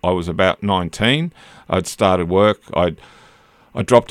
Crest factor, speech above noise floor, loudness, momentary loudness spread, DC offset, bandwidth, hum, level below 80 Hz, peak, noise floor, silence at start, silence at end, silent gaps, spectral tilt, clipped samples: 18 dB; 33 dB; -18 LUFS; 10 LU; under 0.1%; 15.5 kHz; none; -44 dBFS; 0 dBFS; -50 dBFS; 0.05 s; 0.05 s; none; -5.5 dB/octave; under 0.1%